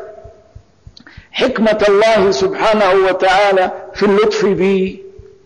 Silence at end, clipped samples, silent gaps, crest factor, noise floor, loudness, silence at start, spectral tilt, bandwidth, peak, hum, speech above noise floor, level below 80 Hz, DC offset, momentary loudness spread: 0.35 s; under 0.1%; none; 8 dB; -43 dBFS; -13 LUFS; 0 s; -5 dB/octave; 10 kHz; -6 dBFS; none; 31 dB; -44 dBFS; under 0.1%; 7 LU